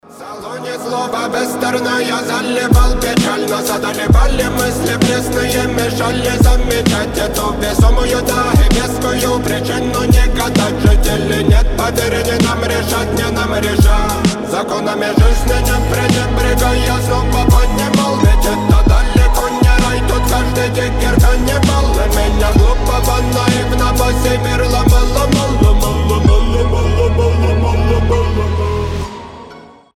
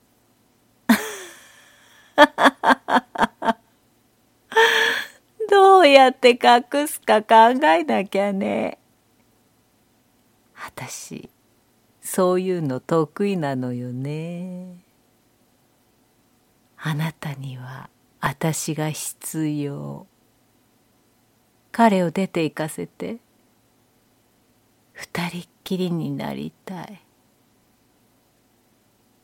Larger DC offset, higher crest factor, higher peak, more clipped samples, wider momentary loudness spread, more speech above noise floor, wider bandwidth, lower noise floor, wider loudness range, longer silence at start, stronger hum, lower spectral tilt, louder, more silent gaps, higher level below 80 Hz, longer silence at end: neither; second, 12 dB vs 22 dB; about the same, 0 dBFS vs 0 dBFS; neither; second, 5 LU vs 22 LU; second, 25 dB vs 40 dB; about the same, 17 kHz vs 17 kHz; second, -37 dBFS vs -61 dBFS; second, 2 LU vs 18 LU; second, 0.1 s vs 0.9 s; neither; about the same, -5 dB/octave vs -4.5 dB/octave; first, -14 LUFS vs -20 LUFS; neither; first, -16 dBFS vs -64 dBFS; second, 0.35 s vs 2.3 s